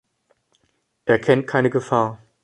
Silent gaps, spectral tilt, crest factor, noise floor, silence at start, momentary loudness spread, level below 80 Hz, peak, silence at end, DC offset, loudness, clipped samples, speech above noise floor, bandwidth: none; -7 dB/octave; 20 dB; -69 dBFS; 1.05 s; 7 LU; -58 dBFS; -2 dBFS; 0.25 s; under 0.1%; -20 LUFS; under 0.1%; 50 dB; 11 kHz